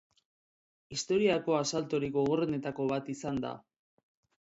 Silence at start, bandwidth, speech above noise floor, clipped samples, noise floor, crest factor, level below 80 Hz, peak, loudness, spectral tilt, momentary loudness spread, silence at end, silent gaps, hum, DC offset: 0.9 s; 8 kHz; over 59 dB; under 0.1%; under -90 dBFS; 18 dB; -66 dBFS; -16 dBFS; -32 LUFS; -5 dB/octave; 10 LU; 1 s; none; none; under 0.1%